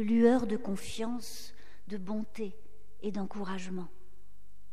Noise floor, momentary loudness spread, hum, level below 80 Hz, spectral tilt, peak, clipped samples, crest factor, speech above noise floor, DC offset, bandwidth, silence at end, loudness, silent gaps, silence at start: -62 dBFS; 19 LU; none; -62 dBFS; -6 dB/octave; -14 dBFS; under 0.1%; 20 dB; 30 dB; 2%; 15 kHz; 0.85 s; -34 LUFS; none; 0 s